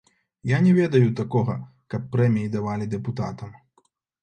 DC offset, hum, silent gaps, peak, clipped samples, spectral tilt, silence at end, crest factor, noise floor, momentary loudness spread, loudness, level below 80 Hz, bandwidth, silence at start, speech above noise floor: under 0.1%; none; none; -6 dBFS; under 0.1%; -8.5 dB/octave; 0.7 s; 18 dB; -66 dBFS; 16 LU; -23 LUFS; -56 dBFS; 8.8 kHz; 0.45 s; 44 dB